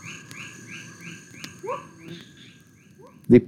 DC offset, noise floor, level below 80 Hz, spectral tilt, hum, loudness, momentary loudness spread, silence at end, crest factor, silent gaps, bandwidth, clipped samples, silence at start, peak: under 0.1%; -52 dBFS; -60 dBFS; -7 dB/octave; none; -31 LUFS; 15 LU; 0 s; 24 dB; none; 14 kHz; under 0.1%; 0.05 s; -4 dBFS